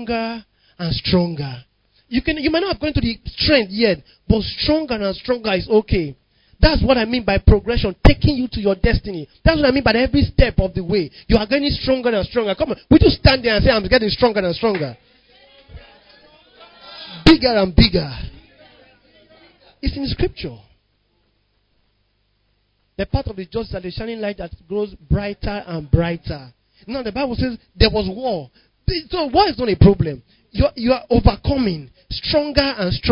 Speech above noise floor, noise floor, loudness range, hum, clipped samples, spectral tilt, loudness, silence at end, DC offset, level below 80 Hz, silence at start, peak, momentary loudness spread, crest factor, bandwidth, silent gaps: 47 dB; -65 dBFS; 13 LU; 50 Hz at -45 dBFS; under 0.1%; -8 dB/octave; -18 LUFS; 0 s; under 0.1%; -26 dBFS; 0 s; 0 dBFS; 14 LU; 18 dB; 8 kHz; none